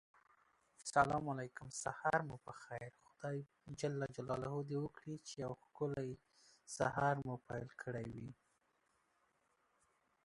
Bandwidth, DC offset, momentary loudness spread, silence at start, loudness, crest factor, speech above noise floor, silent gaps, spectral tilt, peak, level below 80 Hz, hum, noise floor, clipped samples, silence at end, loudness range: 11.5 kHz; under 0.1%; 14 LU; 0.8 s; -43 LUFS; 26 dB; 38 dB; none; -5.5 dB/octave; -18 dBFS; -70 dBFS; none; -80 dBFS; under 0.1%; 1.95 s; 4 LU